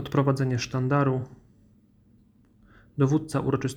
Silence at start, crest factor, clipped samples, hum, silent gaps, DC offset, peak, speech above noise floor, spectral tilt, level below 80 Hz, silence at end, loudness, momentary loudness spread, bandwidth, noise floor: 0 s; 18 dB; under 0.1%; none; none; under 0.1%; -10 dBFS; 35 dB; -7 dB/octave; -56 dBFS; 0 s; -26 LUFS; 8 LU; 11.5 kHz; -59 dBFS